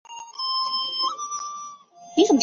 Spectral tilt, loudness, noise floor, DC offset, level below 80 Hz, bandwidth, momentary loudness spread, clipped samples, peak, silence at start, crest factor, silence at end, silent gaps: -2 dB/octave; -25 LUFS; -44 dBFS; under 0.1%; -74 dBFS; 7.6 kHz; 16 LU; under 0.1%; -6 dBFS; 0.1 s; 20 dB; 0 s; none